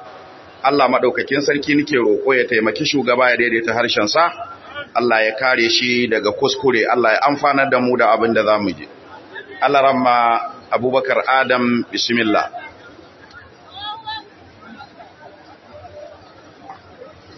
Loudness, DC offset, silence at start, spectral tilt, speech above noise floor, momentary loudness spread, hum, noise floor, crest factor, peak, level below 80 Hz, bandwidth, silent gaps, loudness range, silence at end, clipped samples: -16 LUFS; under 0.1%; 0 s; -4 dB/octave; 27 dB; 16 LU; none; -43 dBFS; 16 dB; -2 dBFS; -60 dBFS; 6.2 kHz; none; 19 LU; 0.05 s; under 0.1%